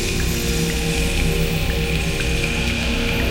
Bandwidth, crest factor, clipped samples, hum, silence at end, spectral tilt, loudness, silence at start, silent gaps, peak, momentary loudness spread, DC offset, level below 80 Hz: 16 kHz; 14 dB; under 0.1%; none; 0 s; -4 dB/octave; -20 LUFS; 0 s; none; -6 dBFS; 1 LU; under 0.1%; -24 dBFS